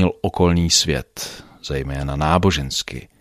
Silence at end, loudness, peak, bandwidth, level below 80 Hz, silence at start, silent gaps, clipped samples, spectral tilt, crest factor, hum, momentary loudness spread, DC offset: 0.15 s; -19 LUFS; -2 dBFS; 15.5 kHz; -34 dBFS; 0 s; none; under 0.1%; -4 dB/octave; 18 dB; none; 15 LU; under 0.1%